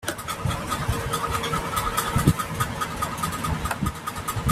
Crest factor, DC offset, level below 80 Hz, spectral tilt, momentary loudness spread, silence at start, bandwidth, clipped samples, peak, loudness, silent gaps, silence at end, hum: 22 dB; under 0.1%; -38 dBFS; -4.5 dB/octave; 7 LU; 0 s; 16 kHz; under 0.1%; -4 dBFS; -26 LUFS; none; 0 s; none